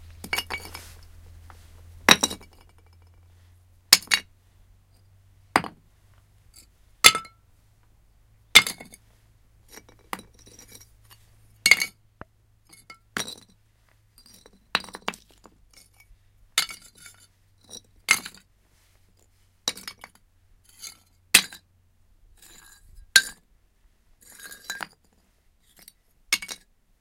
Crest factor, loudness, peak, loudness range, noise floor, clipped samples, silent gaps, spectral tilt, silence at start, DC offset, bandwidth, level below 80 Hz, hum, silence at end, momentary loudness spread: 30 dB; -22 LUFS; 0 dBFS; 13 LU; -64 dBFS; under 0.1%; none; 0 dB/octave; 0.25 s; under 0.1%; 17 kHz; -56 dBFS; none; 0.45 s; 26 LU